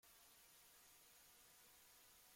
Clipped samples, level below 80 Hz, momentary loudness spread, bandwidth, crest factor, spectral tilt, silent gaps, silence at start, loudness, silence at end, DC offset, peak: under 0.1%; -90 dBFS; 0 LU; 16.5 kHz; 14 dB; 0 dB/octave; none; 0 s; -66 LUFS; 0 s; under 0.1%; -56 dBFS